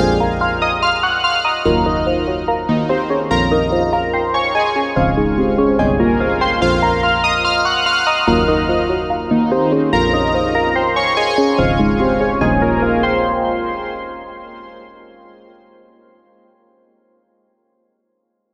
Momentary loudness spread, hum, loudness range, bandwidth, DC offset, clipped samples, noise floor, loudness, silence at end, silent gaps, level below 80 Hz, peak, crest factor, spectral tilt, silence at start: 5 LU; none; 5 LU; 10.5 kHz; under 0.1%; under 0.1%; -70 dBFS; -16 LUFS; 3.5 s; none; -30 dBFS; -2 dBFS; 16 dB; -6 dB/octave; 0 s